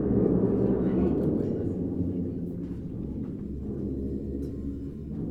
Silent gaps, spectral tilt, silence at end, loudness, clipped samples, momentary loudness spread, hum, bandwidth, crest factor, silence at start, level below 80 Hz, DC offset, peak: none; -11.5 dB/octave; 0 s; -30 LUFS; under 0.1%; 11 LU; none; 4.3 kHz; 16 dB; 0 s; -42 dBFS; under 0.1%; -12 dBFS